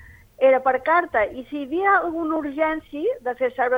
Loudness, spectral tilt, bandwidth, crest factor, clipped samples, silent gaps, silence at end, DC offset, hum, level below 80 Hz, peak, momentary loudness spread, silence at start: -22 LUFS; -6 dB/octave; 4.8 kHz; 16 dB; under 0.1%; none; 0 s; under 0.1%; none; -54 dBFS; -6 dBFS; 8 LU; 0 s